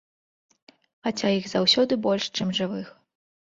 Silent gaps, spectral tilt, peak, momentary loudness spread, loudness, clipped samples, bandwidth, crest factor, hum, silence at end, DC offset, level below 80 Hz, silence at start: none; -4.5 dB/octave; -8 dBFS; 13 LU; -24 LUFS; under 0.1%; 7.8 kHz; 20 dB; none; 0.7 s; under 0.1%; -66 dBFS; 1.05 s